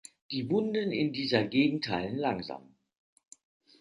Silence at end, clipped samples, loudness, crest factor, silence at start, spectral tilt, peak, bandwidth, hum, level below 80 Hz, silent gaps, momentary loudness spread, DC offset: 1.2 s; under 0.1%; -30 LUFS; 22 dB; 0.3 s; -6 dB/octave; -10 dBFS; 11.5 kHz; none; -66 dBFS; none; 10 LU; under 0.1%